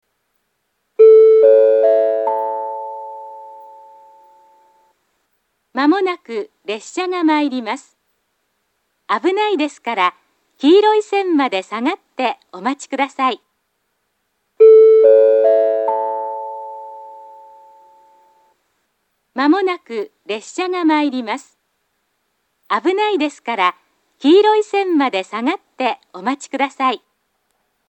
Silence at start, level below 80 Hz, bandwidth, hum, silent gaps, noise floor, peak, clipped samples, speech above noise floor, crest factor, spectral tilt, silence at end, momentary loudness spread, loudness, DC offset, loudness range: 1 s; -82 dBFS; 8.6 kHz; none; none; -70 dBFS; 0 dBFS; under 0.1%; 53 dB; 16 dB; -3.5 dB/octave; 0.9 s; 18 LU; -15 LUFS; under 0.1%; 11 LU